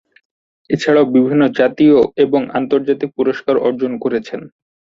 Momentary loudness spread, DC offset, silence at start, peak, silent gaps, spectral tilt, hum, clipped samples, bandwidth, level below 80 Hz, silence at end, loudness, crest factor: 9 LU; under 0.1%; 0.7 s; -2 dBFS; none; -7 dB/octave; none; under 0.1%; 7.6 kHz; -56 dBFS; 0.5 s; -15 LUFS; 14 dB